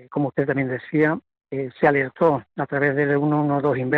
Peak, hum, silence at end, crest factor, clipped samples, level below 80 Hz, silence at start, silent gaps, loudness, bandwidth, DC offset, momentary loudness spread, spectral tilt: -4 dBFS; none; 0 s; 18 dB; under 0.1%; -60 dBFS; 0.1 s; none; -22 LUFS; 4.5 kHz; under 0.1%; 9 LU; -10 dB/octave